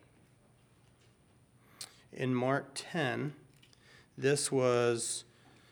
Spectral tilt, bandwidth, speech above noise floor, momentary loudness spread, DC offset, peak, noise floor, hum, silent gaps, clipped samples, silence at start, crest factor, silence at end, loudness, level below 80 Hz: -4.5 dB/octave; over 20 kHz; 33 dB; 19 LU; under 0.1%; -16 dBFS; -65 dBFS; none; none; under 0.1%; 1.8 s; 20 dB; 0.5 s; -33 LUFS; -76 dBFS